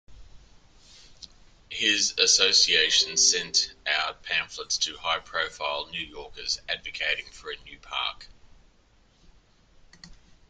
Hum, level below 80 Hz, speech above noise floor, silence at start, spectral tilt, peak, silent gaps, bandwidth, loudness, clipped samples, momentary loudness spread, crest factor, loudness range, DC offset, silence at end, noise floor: none; -56 dBFS; 34 dB; 0.1 s; 1 dB/octave; -6 dBFS; none; 13 kHz; -24 LUFS; under 0.1%; 17 LU; 24 dB; 12 LU; under 0.1%; 0.35 s; -61 dBFS